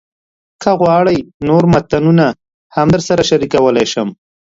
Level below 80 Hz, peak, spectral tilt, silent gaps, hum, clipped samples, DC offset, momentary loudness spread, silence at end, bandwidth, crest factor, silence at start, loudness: -42 dBFS; 0 dBFS; -6 dB/octave; 1.34-1.40 s, 2.54-2.70 s; none; under 0.1%; under 0.1%; 9 LU; 0.45 s; 7.8 kHz; 12 dB; 0.6 s; -13 LUFS